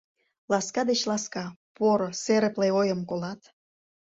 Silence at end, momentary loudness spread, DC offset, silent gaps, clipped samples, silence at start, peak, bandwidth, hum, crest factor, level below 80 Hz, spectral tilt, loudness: 0.7 s; 12 LU; under 0.1%; 1.56-1.75 s; under 0.1%; 0.5 s; -10 dBFS; 8 kHz; none; 16 dB; -70 dBFS; -4.5 dB/octave; -26 LUFS